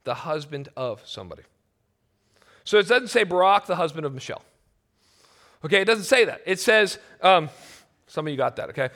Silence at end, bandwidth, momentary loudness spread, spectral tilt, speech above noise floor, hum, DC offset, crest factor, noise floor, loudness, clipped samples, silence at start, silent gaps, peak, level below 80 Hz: 0.05 s; 17 kHz; 18 LU; -3.5 dB/octave; 48 dB; none; under 0.1%; 20 dB; -71 dBFS; -22 LUFS; under 0.1%; 0.05 s; none; -4 dBFS; -68 dBFS